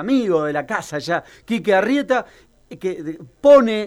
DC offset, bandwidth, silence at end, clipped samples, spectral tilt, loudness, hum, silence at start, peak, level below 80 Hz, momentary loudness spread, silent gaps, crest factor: under 0.1%; 13 kHz; 0 s; under 0.1%; -5.5 dB/octave; -19 LUFS; none; 0 s; -2 dBFS; -56 dBFS; 15 LU; none; 16 dB